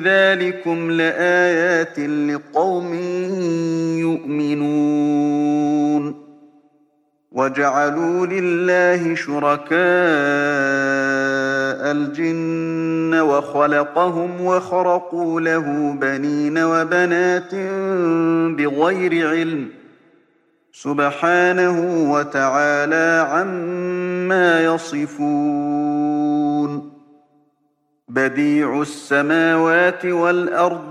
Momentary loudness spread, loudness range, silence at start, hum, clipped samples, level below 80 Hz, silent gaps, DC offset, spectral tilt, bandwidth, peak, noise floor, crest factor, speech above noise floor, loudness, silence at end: 7 LU; 3 LU; 0 s; none; under 0.1%; -70 dBFS; none; under 0.1%; -6 dB/octave; 11 kHz; -2 dBFS; -66 dBFS; 16 dB; 48 dB; -18 LUFS; 0 s